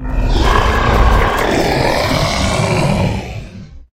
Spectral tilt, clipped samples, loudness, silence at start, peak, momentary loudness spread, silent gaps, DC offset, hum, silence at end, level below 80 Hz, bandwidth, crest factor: -5 dB/octave; under 0.1%; -14 LUFS; 0 s; 0 dBFS; 9 LU; none; under 0.1%; none; 0.15 s; -18 dBFS; 16.5 kHz; 14 dB